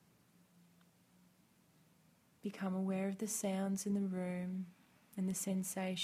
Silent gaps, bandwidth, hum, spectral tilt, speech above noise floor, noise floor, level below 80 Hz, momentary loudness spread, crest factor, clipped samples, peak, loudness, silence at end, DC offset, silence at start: none; 16 kHz; none; -5 dB/octave; 32 dB; -71 dBFS; -82 dBFS; 10 LU; 16 dB; under 0.1%; -26 dBFS; -40 LUFS; 0 s; under 0.1%; 2.45 s